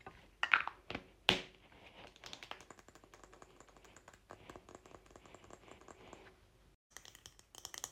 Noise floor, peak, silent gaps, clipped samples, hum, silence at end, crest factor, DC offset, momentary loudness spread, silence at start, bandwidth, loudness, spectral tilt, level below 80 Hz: -64 dBFS; -8 dBFS; 6.75-6.90 s; under 0.1%; none; 0 s; 38 dB; under 0.1%; 26 LU; 0.05 s; 16.5 kHz; -38 LUFS; -2 dB/octave; -68 dBFS